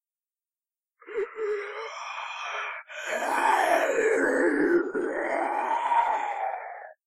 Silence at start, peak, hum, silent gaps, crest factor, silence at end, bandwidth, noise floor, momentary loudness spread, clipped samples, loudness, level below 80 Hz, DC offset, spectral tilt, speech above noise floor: 1.05 s; -10 dBFS; none; none; 16 dB; 0.15 s; 15.5 kHz; under -90 dBFS; 12 LU; under 0.1%; -27 LUFS; -70 dBFS; under 0.1%; -3 dB/octave; over 66 dB